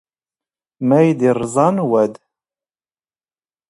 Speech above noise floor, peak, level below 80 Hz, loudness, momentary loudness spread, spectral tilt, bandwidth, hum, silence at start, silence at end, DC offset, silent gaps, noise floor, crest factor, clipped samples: over 75 dB; 0 dBFS; -60 dBFS; -16 LUFS; 6 LU; -7.5 dB/octave; 11.5 kHz; none; 0.8 s; 1.55 s; under 0.1%; none; under -90 dBFS; 18 dB; under 0.1%